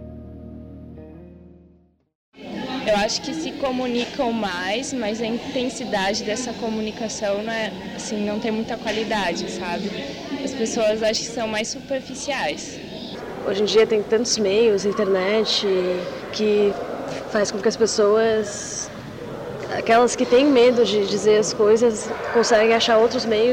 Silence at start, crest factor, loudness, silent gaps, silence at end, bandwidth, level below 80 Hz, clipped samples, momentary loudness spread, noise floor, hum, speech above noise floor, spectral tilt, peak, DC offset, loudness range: 0 s; 14 dB; -21 LUFS; 2.15-2.32 s; 0 s; 15 kHz; -52 dBFS; under 0.1%; 15 LU; -56 dBFS; none; 35 dB; -3.5 dB/octave; -8 dBFS; under 0.1%; 7 LU